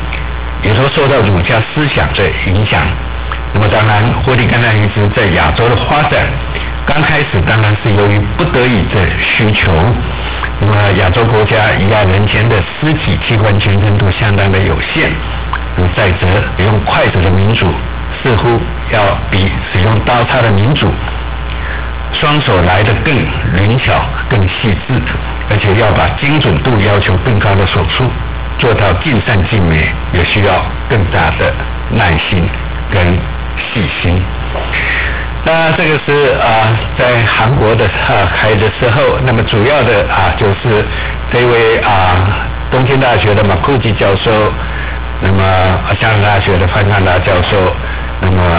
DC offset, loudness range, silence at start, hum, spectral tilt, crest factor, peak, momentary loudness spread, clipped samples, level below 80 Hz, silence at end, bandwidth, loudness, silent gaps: under 0.1%; 2 LU; 0 s; none; -10 dB/octave; 8 dB; -2 dBFS; 7 LU; under 0.1%; -20 dBFS; 0 s; 4 kHz; -11 LUFS; none